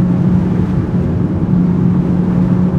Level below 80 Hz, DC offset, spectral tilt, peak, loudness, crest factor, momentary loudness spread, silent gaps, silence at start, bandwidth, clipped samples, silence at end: -30 dBFS; under 0.1%; -11 dB/octave; 0 dBFS; -14 LUFS; 12 dB; 3 LU; none; 0 s; 4 kHz; under 0.1%; 0 s